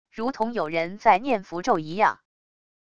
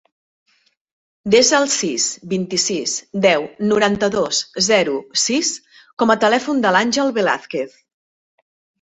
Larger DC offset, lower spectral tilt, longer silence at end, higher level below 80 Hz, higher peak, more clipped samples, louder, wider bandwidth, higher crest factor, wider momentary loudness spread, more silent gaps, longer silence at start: first, 0.5% vs under 0.1%; first, -5.5 dB/octave vs -2.5 dB/octave; second, 0.7 s vs 1.15 s; about the same, -60 dBFS vs -58 dBFS; second, -6 dBFS vs 0 dBFS; neither; second, -24 LUFS vs -17 LUFS; about the same, 8.6 kHz vs 8.4 kHz; about the same, 20 dB vs 18 dB; about the same, 7 LU vs 8 LU; second, none vs 5.93-5.97 s; second, 0.05 s vs 1.25 s